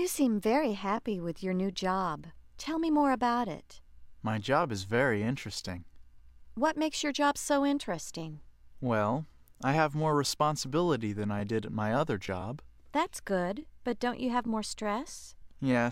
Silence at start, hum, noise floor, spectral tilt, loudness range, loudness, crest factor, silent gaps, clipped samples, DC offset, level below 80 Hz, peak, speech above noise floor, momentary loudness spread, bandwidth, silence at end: 0 s; none; -52 dBFS; -5 dB/octave; 3 LU; -31 LUFS; 20 dB; none; under 0.1%; under 0.1%; -56 dBFS; -12 dBFS; 21 dB; 12 LU; 16 kHz; 0 s